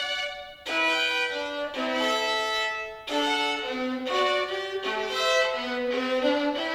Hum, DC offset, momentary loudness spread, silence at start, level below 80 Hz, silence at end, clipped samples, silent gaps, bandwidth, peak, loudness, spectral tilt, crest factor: none; under 0.1%; 7 LU; 0 s; -62 dBFS; 0 s; under 0.1%; none; 16.5 kHz; -12 dBFS; -26 LUFS; -1.5 dB/octave; 16 dB